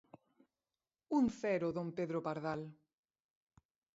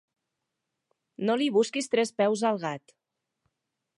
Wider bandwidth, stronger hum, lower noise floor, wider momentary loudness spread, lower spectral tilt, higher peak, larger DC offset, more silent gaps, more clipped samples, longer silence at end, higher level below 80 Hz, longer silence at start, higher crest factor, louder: second, 7.6 kHz vs 11.5 kHz; neither; first, under -90 dBFS vs -84 dBFS; about the same, 8 LU vs 9 LU; first, -7 dB/octave vs -4.5 dB/octave; second, -24 dBFS vs -12 dBFS; neither; neither; neither; about the same, 1.25 s vs 1.2 s; first, -72 dBFS vs -82 dBFS; about the same, 1.1 s vs 1.2 s; about the same, 18 dB vs 18 dB; second, -38 LUFS vs -27 LUFS